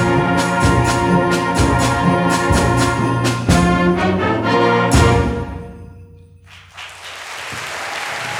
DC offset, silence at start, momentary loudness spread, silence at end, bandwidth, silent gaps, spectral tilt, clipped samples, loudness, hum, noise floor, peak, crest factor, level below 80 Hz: under 0.1%; 0 s; 15 LU; 0 s; 17 kHz; none; -5.5 dB/octave; under 0.1%; -16 LUFS; none; -42 dBFS; -2 dBFS; 16 dB; -28 dBFS